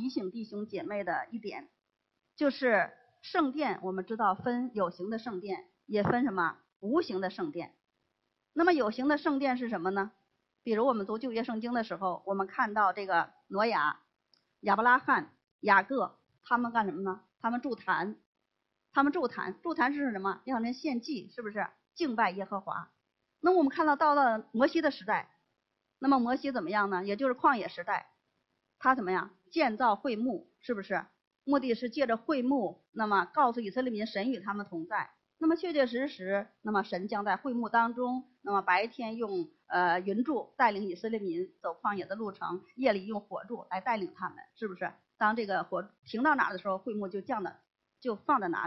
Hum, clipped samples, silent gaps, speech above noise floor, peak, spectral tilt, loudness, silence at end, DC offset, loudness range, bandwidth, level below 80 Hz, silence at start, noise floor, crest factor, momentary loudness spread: none; under 0.1%; 6.76-6.80 s, 15.51-15.59 s, 18.26-18.33 s, 31.27-31.31 s, 45.99-46.03 s; 52 dB; -10 dBFS; -7 dB/octave; -32 LUFS; 0 s; under 0.1%; 4 LU; 6 kHz; -74 dBFS; 0 s; -83 dBFS; 22 dB; 11 LU